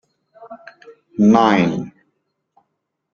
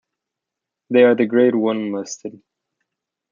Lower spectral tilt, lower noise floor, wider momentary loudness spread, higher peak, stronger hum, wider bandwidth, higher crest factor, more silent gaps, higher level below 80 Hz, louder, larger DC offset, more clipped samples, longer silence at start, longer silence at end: first, -7 dB/octave vs -5.5 dB/octave; second, -75 dBFS vs -84 dBFS; first, 26 LU vs 17 LU; about the same, 0 dBFS vs -2 dBFS; neither; about the same, 7 kHz vs 7.4 kHz; about the same, 20 dB vs 18 dB; neither; first, -56 dBFS vs -72 dBFS; about the same, -15 LUFS vs -17 LUFS; neither; neither; second, 0.4 s vs 0.9 s; first, 1.25 s vs 1 s